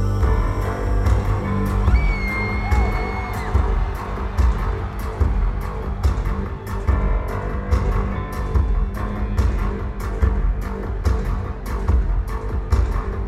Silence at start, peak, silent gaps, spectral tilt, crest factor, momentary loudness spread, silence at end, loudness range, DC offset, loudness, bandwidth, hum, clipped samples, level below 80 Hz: 0 s; -4 dBFS; none; -7.5 dB/octave; 16 dB; 7 LU; 0 s; 3 LU; under 0.1%; -23 LUFS; 13.5 kHz; none; under 0.1%; -22 dBFS